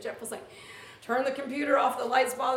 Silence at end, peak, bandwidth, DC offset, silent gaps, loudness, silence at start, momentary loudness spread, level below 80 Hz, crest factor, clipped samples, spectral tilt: 0 s; -10 dBFS; 18 kHz; under 0.1%; none; -28 LUFS; 0 s; 20 LU; -76 dBFS; 18 dB; under 0.1%; -2.5 dB/octave